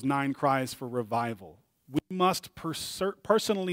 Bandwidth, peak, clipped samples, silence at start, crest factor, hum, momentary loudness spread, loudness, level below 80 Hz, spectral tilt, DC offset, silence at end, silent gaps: 16 kHz; -8 dBFS; under 0.1%; 0 s; 22 dB; none; 8 LU; -30 LUFS; -66 dBFS; -5 dB/octave; under 0.1%; 0 s; none